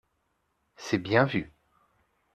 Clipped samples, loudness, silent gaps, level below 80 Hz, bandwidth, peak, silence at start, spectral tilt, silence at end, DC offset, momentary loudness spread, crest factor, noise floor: under 0.1%; -27 LUFS; none; -62 dBFS; 13 kHz; -6 dBFS; 0.8 s; -6 dB/octave; 0.85 s; under 0.1%; 19 LU; 24 dB; -75 dBFS